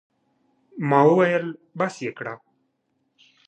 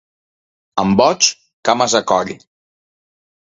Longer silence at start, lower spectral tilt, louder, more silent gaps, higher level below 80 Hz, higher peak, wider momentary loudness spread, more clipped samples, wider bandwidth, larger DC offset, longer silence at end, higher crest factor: about the same, 0.75 s vs 0.75 s; first, -7 dB/octave vs -3 dB/octave; second, -21 LUFS vs -15 LUFS; second, none vs 1.53-1.63 s; second, -76 dBFS vs -52 dBFS; about the same, -2 dBFS vs 0 dBFS; first, 19 LU vs 12 LU; neither; first, 9.2 kHz vs 7.8 kHz; neither; about the same, 1.1 s vs 1.05 s; about the same, 22 dB vs 18 dB